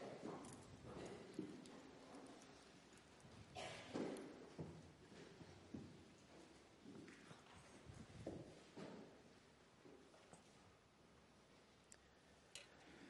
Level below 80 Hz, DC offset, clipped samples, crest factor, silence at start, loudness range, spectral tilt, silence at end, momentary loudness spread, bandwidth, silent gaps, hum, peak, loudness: -80 dBFS; under 0.1%; under 0.1%; 24 dB; 0 s; 10 LU; -5 dB/octave; 0 s; 13 LU; 11.5 kHz; none; none; -36 dBFS; -59 LUFS